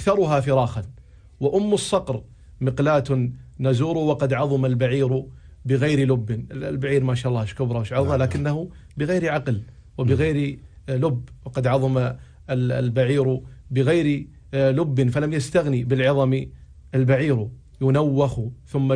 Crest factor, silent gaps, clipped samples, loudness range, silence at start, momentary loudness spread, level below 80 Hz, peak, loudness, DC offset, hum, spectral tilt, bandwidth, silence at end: 16 dB; none; under 0.1%; 2 LU; 0 s; 10 LU; -46 dBFS; -6 dBFS; -22 LUFS; under 0.1%; none; -7.5 dB/octave; 10.5 kHz; 0 s